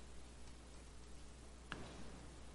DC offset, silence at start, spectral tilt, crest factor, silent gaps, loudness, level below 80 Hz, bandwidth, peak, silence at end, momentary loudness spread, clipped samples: under 0.1%; 0 s; -4 dB/octave; 26 dB; none; -57 LUFS; -58 dBFS; 11.5 kHz; -28 dBFS; 0 s; 7 LU; under 0.1%